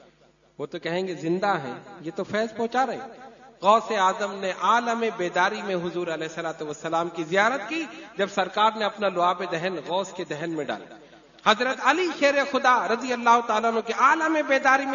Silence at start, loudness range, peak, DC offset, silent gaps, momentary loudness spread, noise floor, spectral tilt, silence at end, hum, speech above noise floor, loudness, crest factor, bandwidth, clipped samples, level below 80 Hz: 0.6 s; 5 LU; -4 dBFS; under 0.1%; none; 12 LU; -59 dBFS; -4 dB/octave; 0 s; none; 34 dB; -24 LUFS; 20 dB; 7.4 kHz; under 0.1%; -70 dBFS